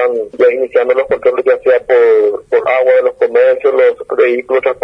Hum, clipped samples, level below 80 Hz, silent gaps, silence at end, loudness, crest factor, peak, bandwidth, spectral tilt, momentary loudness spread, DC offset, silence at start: none; under 0.1%; -54 dBFS; none; 0.1 s; -11 LUFS; 10 dB; 0 dBFS; 5.2 kHz; -5.5 dB/octave; 4 LU; under 0.1%; 0 s